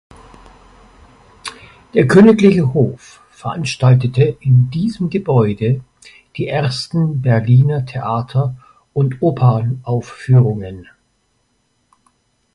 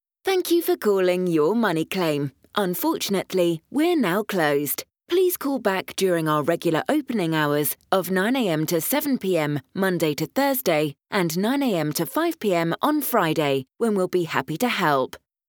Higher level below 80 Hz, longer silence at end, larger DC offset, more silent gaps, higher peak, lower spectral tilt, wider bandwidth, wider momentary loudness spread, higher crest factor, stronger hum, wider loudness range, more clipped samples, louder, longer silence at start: first, -46 dBFS vs -70 dBFS; first, 1.7 s vs 0.3 s; neither; neither; first, 0 dBFS vs -4 dBFS; first, -8 dB/octave vs -5 dB/octave; second, 11.5 kHz vs over 20 kHz; first, 17 LU vs 4 LU; about the same, 16 dB vs 18 dB; neither; first, 5 LU vs 1 LU; neither; first, -15 LUFS vs -23 LUFS; first, 1.45 s vs 0.25 s